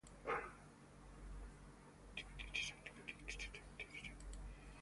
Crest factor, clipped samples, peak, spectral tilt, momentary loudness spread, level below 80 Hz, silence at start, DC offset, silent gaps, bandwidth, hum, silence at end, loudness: 22 dB; under 0.1%; -30 dBFS; -3 dB/octave; 17 LU; -58 dBFS; 0.05 s; under 0.1%; none; 11.5 kHz; none; 0 s; -50 LUFS